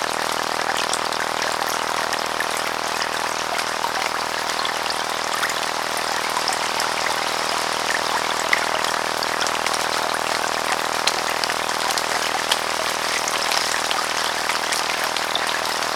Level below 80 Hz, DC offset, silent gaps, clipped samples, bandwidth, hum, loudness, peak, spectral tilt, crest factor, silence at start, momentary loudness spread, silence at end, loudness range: -56 dBFS; under 0.1%; none; under 0.1%; 19.5 kHz; none; -21 LUFS; 0 dBFS; -0.5 dB/octave; 22 dB; 0 s; 3 LU; 0 s; 2 LU